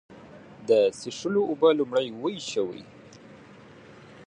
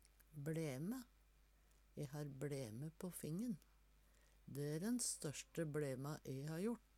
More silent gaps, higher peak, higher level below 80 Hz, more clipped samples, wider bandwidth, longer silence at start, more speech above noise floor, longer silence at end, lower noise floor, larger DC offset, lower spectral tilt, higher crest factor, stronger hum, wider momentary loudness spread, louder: neither; first, -8 dBFS vs -32 dBFS; about the same, -70 dBFS vs -72 dBFS; neither; second, 10.5 kHz vs 17 kHz; second, 0.1 s vs 0.3 s; about the same, 24 dB vs 26 dB; second, 0 s vs 0.15 s; second, -49 dBFS vs -72 dBFS; neither; about the same, -5 dB/octave vs -5 dB/octave; about the same, 20 dB vs 16 dB; neither; about the same, 12 LU vs 11 LU; first, -25 LUFS vs -47 LUFS